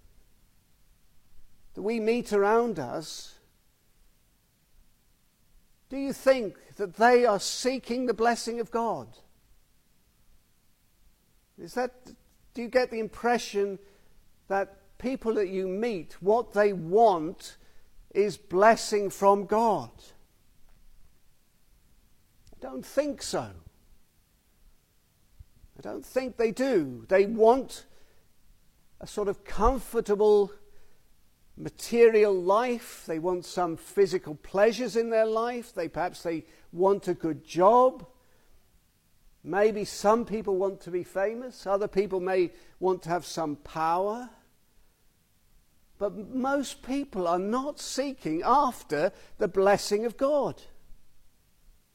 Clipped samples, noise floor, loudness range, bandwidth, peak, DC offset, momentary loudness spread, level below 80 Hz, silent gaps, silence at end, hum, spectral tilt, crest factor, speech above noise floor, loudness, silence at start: under 0.1%; -66 dBFS; 11 LU; 16.5 kHz; -8 dBFS; under 0.1%; 15 LU; -52 dBFS; none; 0.75 s; none; -4.5 dB/octave; 20 dB; 40 dB; -27 LUFS; 1.35 s